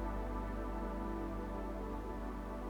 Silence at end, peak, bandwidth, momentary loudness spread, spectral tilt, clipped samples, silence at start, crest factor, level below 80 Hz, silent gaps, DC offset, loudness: 0 s; -28 dBFS; 17 kHz; 2 LU; -8 dB/octave; under 0.1%; 0 s; 12 dB; -44 dBFS; none; under 0.1%; -43 LUFS